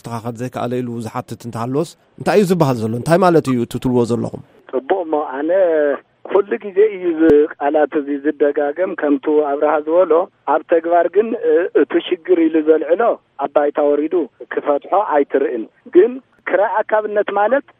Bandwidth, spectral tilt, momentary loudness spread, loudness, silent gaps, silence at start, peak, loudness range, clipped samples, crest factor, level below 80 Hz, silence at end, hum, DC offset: 15.5 kHz; -7 dB/octave; 10 LU; -17 LUFS; none; 0.05 s; 0 dBFS; 2 LU; under 0.1%; 16 dB; -52 dBFS; 0.2 s; none; under 0.1%